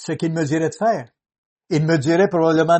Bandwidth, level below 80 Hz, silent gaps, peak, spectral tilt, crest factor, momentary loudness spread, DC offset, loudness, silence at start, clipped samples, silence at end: 8.8 kHz; -62 dBFS; 1.38-1.56 s; -4 dBFS; -6.5 dB/octave; 16 dB; 7 LU; under 0.1%; -19 LUFS; 0 s; under 0.1%; 0 s